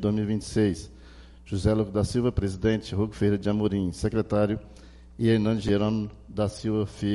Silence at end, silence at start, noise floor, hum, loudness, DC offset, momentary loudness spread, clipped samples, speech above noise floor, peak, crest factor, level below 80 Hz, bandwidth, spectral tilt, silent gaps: 0 s; 0 s; -48 dBFS; none; -27 LUFS; under 0.1%; 6 LU; under 0.1%; 22 dB; -10 dBFS; 16 dB; -44 dBFS; 11.5 kHz; -7 dB/octave; none